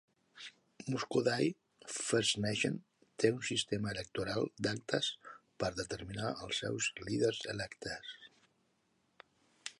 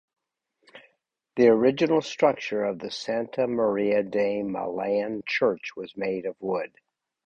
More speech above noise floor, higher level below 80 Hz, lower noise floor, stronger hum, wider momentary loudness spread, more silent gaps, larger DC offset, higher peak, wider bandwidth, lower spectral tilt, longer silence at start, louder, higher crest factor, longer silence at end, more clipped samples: second, 41 dB vs 49 dB; about the same, -66 dBFS vs -66 dBFS; about the same, -77 dBFS vs -74 dBFS; neither; first, 18 LU vs 11 LU; neither; neither; second, -14 dBFS vs -6 dBFS; first, 11.5 kHz vs 8.2 kHz; second, -4 dB/octave vs -5.5 dB/octave; second, 0.35 s vs 0.75 s; second, -36 LUFS vs -25 LUFS; about the same, 24 dB vs 20 dB; second, 0.1 s vs 0.6 s; neither